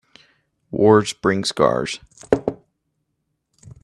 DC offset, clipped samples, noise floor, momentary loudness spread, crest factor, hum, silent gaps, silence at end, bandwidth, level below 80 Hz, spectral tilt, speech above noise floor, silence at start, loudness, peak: under 0.1%; under 0.1%; -74 dBFS; 14 LU; 22 dB; none; none; 0.15 s; 12 kHz; -52 dBFS; -5 dB/octave; 56 dB; 0.7 s; -19 LUFS; 0 dBFS